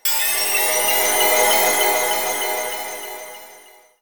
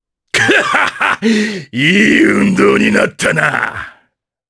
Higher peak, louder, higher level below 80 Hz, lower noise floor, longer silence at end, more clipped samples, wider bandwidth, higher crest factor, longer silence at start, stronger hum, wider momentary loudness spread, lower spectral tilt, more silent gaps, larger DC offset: second, -4 dBFS vs 0 dBFS; second, -16 LUFS vs -11 LUFS; second, -62 dBFS vs -48 dBFS; second, -47 dBFS vs -60 dBFS; second, 0.25 s vs 0.6 s; neither; first, 19.5 kHz vs 11 kHz; about the same, 16 dB vs 12 dB; second, 0.05 s vs 0.35 s; neither; first, 15 LU vs 9 LU; second, 1 dB/octave vs -4.5 dB/octave; neither; first, 0.5% vs under 0.1%